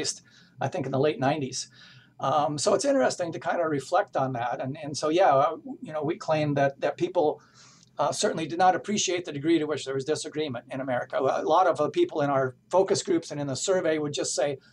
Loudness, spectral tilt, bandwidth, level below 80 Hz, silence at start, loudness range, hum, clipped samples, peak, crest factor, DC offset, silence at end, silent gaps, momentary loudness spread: -26 LUFS; -4.5 dB/octave; 12 kHz; -70 dBFS; 0 s; 2 LU; none; under 0.1%; -10 dBFS; 16 dB; under 0.1%; 0.15 s; none; 9 LU